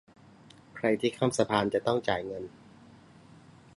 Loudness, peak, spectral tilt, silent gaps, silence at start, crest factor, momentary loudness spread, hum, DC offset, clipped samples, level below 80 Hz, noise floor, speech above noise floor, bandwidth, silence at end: -29 LUFS; -10 dBFS; -5 dB/octave; none; 0.75 s; 22 dB; 14 LU; none; under 0.1%; under 0.1%; -64 dBFS; -55 dBFS; 27 dB; 11.5 kHz; 1.3 s